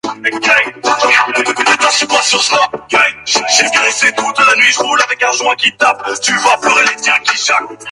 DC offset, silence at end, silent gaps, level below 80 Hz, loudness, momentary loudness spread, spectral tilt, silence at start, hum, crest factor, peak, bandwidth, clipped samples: under 0.1%; 0 s; none; -58 dBFS; -10 LUFS; 4 LU; 0 dB/octave; 0.05 s; none; 12 dB; 0 dBFS; 16 kHz; under 0.1%